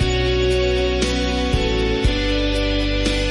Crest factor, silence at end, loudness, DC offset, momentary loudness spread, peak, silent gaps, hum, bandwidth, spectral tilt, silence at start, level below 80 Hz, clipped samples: 12 dB; 0 s; -19 LUFS; under 0.1%; 2 LU; -6 dBFS; none; none; 11.5 kHz; -5 dB/octave; 0 s; -24 dBFS; under 0.1%